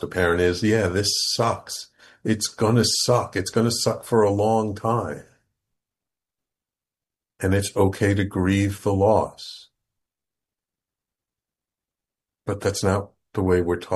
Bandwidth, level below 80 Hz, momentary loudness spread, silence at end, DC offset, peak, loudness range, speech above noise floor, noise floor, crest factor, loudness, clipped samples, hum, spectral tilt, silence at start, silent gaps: 12.5 kHz; -52 dBFS; 13 LU; 0 s; under 0.1%; -4 dBFS; 9 LU; 68 dB; -89 dBFS; 18 dB; -22 LUFS; under 0.1%; none; -4.5 dB/octave; 0 s; none